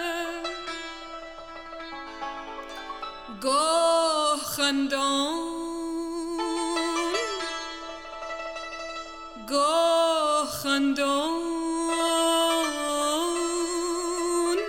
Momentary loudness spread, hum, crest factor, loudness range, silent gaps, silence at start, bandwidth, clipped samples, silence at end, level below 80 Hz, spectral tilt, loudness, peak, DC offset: 15 LU; none; 16 dB; 6 LU; none; 0 s; 17.5 kHz; under 0.1%; 0 s; -54 dBFS; -1.5 dB/octave; -26 LUFS; -10 dBFS; under 0.1%